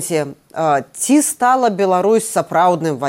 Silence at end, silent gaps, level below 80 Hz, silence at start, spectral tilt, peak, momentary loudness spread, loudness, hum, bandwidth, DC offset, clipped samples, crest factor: 0 s; none; -66 dBFS; 0 s; -4.5 dB/octave; -4 dBFS; 7 LU; -15 LUFS; none; 17 kHz; under 0.1%; under 0.1%; 12 dB